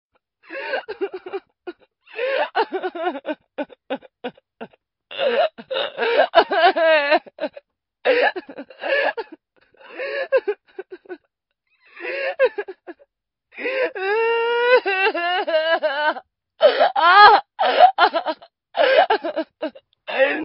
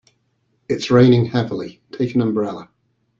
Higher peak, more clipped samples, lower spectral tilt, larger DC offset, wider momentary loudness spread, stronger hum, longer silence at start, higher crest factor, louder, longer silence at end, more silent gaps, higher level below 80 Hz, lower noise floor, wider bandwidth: about the same, 0 dBFS vs -2 dBFS; neither; second, 2 dB/octave vs -7.5 dB/octave; neither; first, 21 LU vs 16 LU; neither; second, 0.5 s vs 0.7 s; about the same, 20 dB vs 18 dB; about the same, -19 LUFS vs -18 LUFS; second, 0 s vs 0.55 s; neither; second, -68 dBFS vs -54 dBFS; first, -73 dBFS vs -66 dBFS; second, 5.8 kHz vs 7.6 kHz